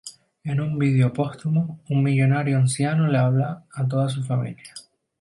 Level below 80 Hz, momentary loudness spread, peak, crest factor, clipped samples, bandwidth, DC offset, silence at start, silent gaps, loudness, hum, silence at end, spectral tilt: -62 dBFS; 14 LU; -8 dBFS; 14 dB; under 0.1%; 11.5 kHz; under 0.1%; 0.05 s; none; -22 LUFS; none; 0.4 s; -7 dB/octave